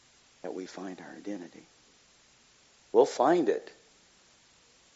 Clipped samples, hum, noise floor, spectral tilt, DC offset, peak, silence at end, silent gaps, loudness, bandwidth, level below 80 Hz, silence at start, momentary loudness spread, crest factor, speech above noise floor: under 0.1%; none; -62 dBFS; -4.5 dB/octave; under 0.1%; -10 dBFS; 1.3 s; none; -30 LUFS; 8 kHz; -80 dBFS; 0.45 s; 20 LU; 24 dB; 33 dB